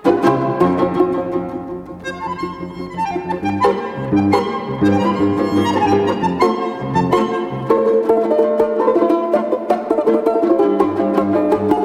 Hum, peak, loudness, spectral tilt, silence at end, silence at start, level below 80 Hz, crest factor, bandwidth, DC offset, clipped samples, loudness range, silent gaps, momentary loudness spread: none; 0 dBFS; -17 LUFS; -7.5 dB/octave; 0 s; 0 s; -50 dBFS; 16 dB; 13 kHz; under 0.1%; under 0.1%; 5 LU; none; 10 LU